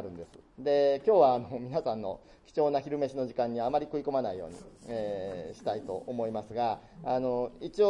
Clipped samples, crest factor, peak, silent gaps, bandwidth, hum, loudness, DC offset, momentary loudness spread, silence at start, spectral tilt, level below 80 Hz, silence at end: under 0.1%; 20 dB; -12 dBFS; none; 10.5 kHz; none; -31 LUFS; under 0.1%; 14 LU; 0 s; -7 dB/octave; -62 dBFS; 0 s